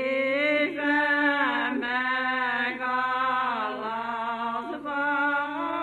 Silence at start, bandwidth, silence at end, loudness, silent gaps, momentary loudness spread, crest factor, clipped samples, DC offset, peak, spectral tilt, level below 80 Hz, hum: 0 s; 11 kHz; 0 s; -26 LUFS; none; 8 LU; 16 dB; under 0.1%; under 0.1%; -10 dBFS; -4.5 dB/octave; -68 dBFS; 50 Hz at -70 dBFS